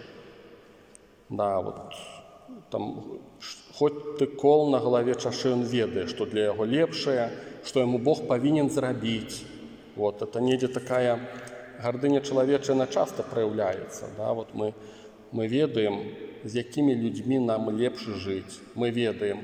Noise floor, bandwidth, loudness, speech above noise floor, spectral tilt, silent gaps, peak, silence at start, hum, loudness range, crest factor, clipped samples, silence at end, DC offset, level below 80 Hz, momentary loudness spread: -54 dBFS; 15 kHz; -27 LUFS; 28 dB; -6 dB/octave; none; -8 dBFS; 0 s; none; 5 LU; 18 dB; under 0.1%; 0 s; under 0.1%; -66 dBFS; 16 LU